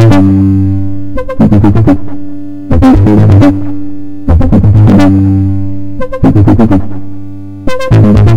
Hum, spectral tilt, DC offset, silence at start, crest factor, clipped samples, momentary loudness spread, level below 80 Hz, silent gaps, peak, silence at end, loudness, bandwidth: none; -9.5 dB/octave; under 0.1%; 0 s; 6 dB; 7%; 18 LU; -18 dBFS; none; 0 dBFS; 0 s; -7 LUFS; 7.6 kHz